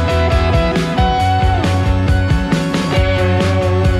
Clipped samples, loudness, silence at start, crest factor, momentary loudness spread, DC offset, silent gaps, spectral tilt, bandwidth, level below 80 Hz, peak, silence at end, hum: under 0.1%; -15 LUFS; 0 s; 10 dB; 2 LU; under 0.1%; none; -6.5 dB/octave; 12.5 kHz; -20 dBFS; -2 dBFS; 0 s; none